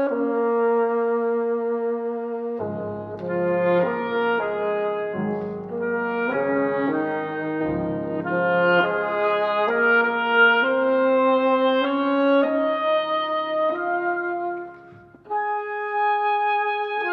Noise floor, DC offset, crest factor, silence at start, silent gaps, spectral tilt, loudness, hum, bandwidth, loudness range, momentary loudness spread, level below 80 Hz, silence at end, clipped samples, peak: -46 dBFS; under 0.1%; 16 dB; 0 s; none; -8.5 dB/octave; -22 LUFS; none; 5.2 kHz; 6 LU; 10 LU; -62 dBFS; 0 s; under 0.1%; -6 dBFS